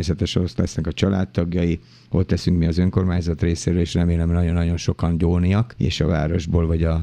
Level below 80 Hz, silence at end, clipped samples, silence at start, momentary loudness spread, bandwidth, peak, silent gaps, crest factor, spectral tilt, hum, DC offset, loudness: -32 dBFS; 0 s; under 0.1%; 0 s; 4 LU; 9.4 kHz; -2 dBFS; none; 16 dB; -7 dB/octave; none; under 0.1%; -21 LUFS